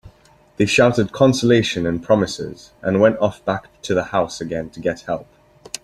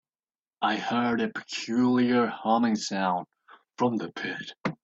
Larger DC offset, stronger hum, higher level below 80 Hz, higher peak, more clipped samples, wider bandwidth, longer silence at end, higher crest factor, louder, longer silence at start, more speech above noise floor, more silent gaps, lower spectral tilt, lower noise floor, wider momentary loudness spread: neither; neither; first, -50 dBFS vs -70 dBFS; first, -2 dBFS vs -10 dBFS; neither; first, 13 kHz vs 8 kHz; about the same, 0.05 s vs 0.1 s; about the same, 18 dB vs 18 dB; first, -19 LUFS vs -27 LUFS; second, 0.05 s vs 0.6 s; second, 32 dB vs over 63 dB; neither; about the same, -5.5 dB/octave vs -5 dB/octave; second, -50 dBFS vs under -90 dBFS; first, 13 LU vs 10 LU